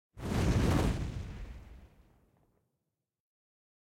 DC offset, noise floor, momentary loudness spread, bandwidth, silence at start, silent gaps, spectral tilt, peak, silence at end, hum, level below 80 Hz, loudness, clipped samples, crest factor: under 0.1%; -86 dBFS; 20 LU; 16.5 kHz; 0.15 s; none; -6.5 dB/octave; -16 dBFS; 1.95 s; none; -42 dBFS; -32 LUFS; under 0.1%; 18 dB